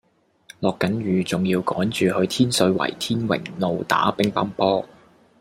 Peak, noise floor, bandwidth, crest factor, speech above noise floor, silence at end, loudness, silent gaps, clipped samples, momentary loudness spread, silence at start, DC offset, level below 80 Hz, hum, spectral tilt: -2 dBFS; -50 dBFS; 16 kHz; 20 dB; 29 dB; 0.55 s; -22 LUFS; none; under 0.1%; 6 LU; 0.6 s; under 0.1%; -58 dBFS; none; -5 dB/octave